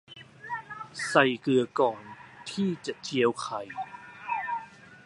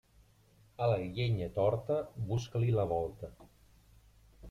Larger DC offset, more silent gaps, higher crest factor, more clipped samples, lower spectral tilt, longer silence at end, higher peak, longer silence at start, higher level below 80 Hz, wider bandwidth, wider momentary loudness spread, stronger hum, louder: neither; neither; first, 24 dB vs 18 dB; neither; second, -5 dB/octave vs -7.5 dB/octave; about the same, 0.1 s vs 0 s; first, -6 dBFS vs -18 dBFS; second, 0.1 s vs 0.8 s; second, -72 dBFS vs -58 dBFS; first, 11.5 kHz vs 7.2 kHz; first, 19 LU vs 7 LU; neither; first, -29 LUFS vs -34 LUFS